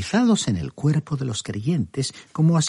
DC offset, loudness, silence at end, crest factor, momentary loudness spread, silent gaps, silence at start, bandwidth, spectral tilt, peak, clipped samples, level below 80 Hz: under 0.1%; -23 LUFS; 0 s; 14 dB; 8 LU; none; 0 s; 11.5 kHz; -5.5 dB/octave; -8 dBFS; under 0.1%; -52 dBFS